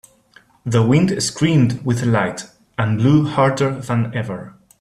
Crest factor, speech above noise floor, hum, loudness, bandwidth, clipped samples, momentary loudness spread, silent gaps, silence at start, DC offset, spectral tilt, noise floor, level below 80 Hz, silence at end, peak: 16 dB; 35 dB; none; -18 LUFS; 13 kHz; under 0.1%; 13 LU; none; 0.65 s; under 0.1%; -6 dB/octave; -52 dBFS; -52 dBFS; 0.3 s; -2 dBFS